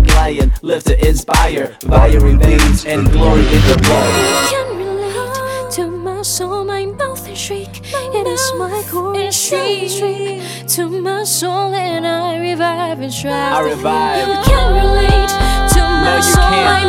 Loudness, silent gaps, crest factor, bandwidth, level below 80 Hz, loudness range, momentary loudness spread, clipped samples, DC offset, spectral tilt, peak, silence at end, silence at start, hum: -14 LUFS; none; 12 dB; 19.5 kHz; -16 dBFS; 8 LU; 10 LU; under 0.1%; under 0.1%; -4.5 dB/octave; 0 dBFS; 0 s; 0 s; none